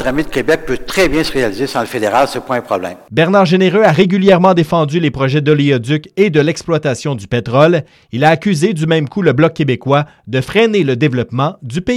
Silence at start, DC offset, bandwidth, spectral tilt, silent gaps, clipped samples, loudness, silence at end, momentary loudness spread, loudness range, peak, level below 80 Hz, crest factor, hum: 0 s; under 0.1%; 16.5 kHz; -6.5 dB/octave; none; under 0.1%; -13 LUFS; 0 s; 8 LU; 3 LU; 0 dBFS; -38 dBFS; 12 dB; none